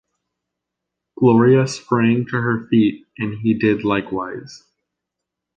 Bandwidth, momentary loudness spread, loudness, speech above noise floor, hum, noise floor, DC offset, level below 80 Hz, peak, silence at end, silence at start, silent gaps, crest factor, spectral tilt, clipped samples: 9 kHz; 13 LU; -18 LUFS; 65 dB; none; -82 dBFS; under 0.1%; -56 dBFS; -2 dBFS; 1 s; 1.2 s; none; 16 dB; -7 dB/octave; under 0.1%